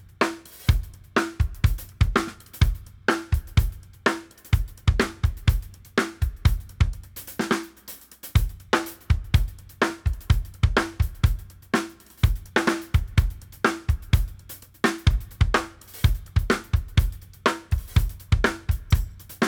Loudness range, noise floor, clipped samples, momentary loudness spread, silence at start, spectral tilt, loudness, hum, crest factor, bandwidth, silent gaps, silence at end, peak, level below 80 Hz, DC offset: 2 LU; -45 dBFS; under 0.1%; 9 LU; 0.2 s; -5.5 dB/octave; -26 LUFS; none; 20 dB; over 20 kHz; none; 0 s; -4 dBFS; -28 dBFS; under 0.1%